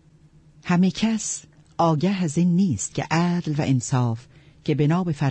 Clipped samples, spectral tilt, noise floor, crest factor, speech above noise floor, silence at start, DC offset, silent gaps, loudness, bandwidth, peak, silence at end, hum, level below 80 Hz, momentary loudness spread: under 0.1%; -6 dB/octave; -53 dBFS; 14 dB; 32 dB; 0.65 s; under 0.1%; none; -23 LUFS; 8.8 kHz; -8 dBFS; 0 s; none; -56 dBFS; 10 LU